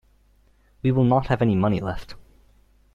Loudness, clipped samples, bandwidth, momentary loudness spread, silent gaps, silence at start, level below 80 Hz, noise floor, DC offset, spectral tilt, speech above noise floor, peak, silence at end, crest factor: -22 LUFS; under 0.1%; 7.2 kHz; 10 LU; none; 0.85 s; -44 dBFS; -59 dBFS; under 0.1%; -9 dB/octave; 38 dB; -4 dBFS; 0.75 s; 20 dB